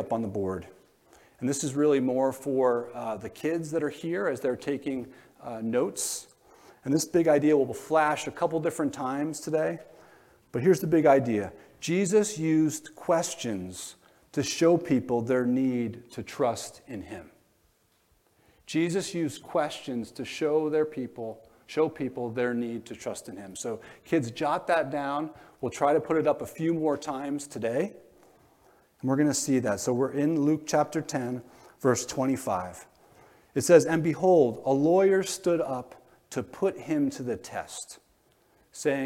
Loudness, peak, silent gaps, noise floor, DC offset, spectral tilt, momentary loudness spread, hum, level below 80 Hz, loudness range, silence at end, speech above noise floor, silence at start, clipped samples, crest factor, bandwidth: -28 LUFS; -6 dBFS; none; -67 dBFS; under 0.1%; -5 dB/octave; 15 LU; none; -68 dBFS; 7 LU; 0 s; 40 dB; 0 s; under 0.1%; 22 dB; 16.5 kHz